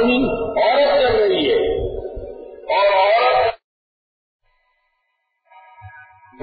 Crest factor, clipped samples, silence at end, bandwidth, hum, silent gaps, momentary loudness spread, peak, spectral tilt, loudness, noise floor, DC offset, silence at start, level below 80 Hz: 14 dB; under 0.1%; 0.4 s; 5 kHz; none; 3.64-4.39 s; 17 LU; -6 dBFS; -9.5 dB/octave; -17 LUFS; -71 dBFS; under 0.1%; 0 s; -42 dBFS